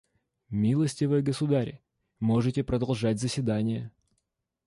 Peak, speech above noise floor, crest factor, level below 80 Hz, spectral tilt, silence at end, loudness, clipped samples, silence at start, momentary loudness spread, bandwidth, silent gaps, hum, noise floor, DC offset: -14 dBFS; 54 dB; 14 dB; -54 dBFS; -7 dB/octave; 0.75 s; -28 LUFS; under 0.1%; 0.5 s; 8 LU; 11.5 kHz; none; none; -81 dBFS; under 0.1%